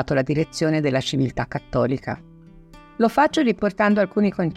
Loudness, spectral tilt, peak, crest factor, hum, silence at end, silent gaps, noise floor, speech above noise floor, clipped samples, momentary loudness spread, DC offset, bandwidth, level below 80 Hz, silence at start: -21 LUFS; -6.5 dB/octave; -6 dBFS; 16 dB; none; 0 s; none; -46 dBFS; 25 dB; under 0.1%; 10 LU; under 0.1%; 13.5 kHz; -48 dBFS; 0 s